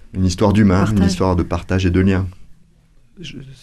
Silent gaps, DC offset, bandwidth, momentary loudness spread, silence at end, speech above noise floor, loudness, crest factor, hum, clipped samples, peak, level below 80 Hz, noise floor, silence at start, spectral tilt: none; under 0.1%; 12 kHz; 20 LU; 0.1 s; 34 dB; -16 LUFS; 14 dB; none; under 0.1%; -2 dBFS; -34 dBFS; -50 dBFS; 0.15 s; -7 dB/octave